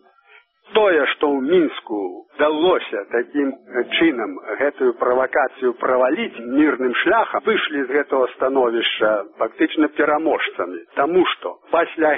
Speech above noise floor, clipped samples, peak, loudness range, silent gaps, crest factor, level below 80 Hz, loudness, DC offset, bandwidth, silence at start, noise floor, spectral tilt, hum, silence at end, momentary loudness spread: 33 dB; under 0.1%; -4 dBFS; 1 LU; none; 16 dB; -62 dBFS; -19 LUFS; under 0.1%; 3.9 kHz; 0.7 s; -52 dBFS; -1.5 dB/octave; none; 0 s; 7 LU